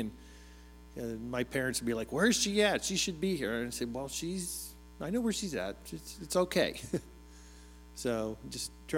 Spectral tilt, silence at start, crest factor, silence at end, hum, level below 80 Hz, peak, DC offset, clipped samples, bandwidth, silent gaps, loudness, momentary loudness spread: -3.5 dB/octave; 0 s; 20 dB; 0 s; none; -54 dBFS; -14 dBFS; under 0.1%; under 0.1%; 17 kHz; none; -33 LUFS; 21 LU